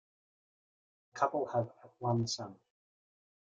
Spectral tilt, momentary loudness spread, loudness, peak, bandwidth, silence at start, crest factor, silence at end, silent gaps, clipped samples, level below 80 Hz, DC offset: -5.5 dB/octave; 13 LU; -36 LUFS; -14 dBFS; 8.8 kHz; 1.15 s; 24 dB; 1.05 s; none; under 0.1%; -76 dBFS; under 0.1%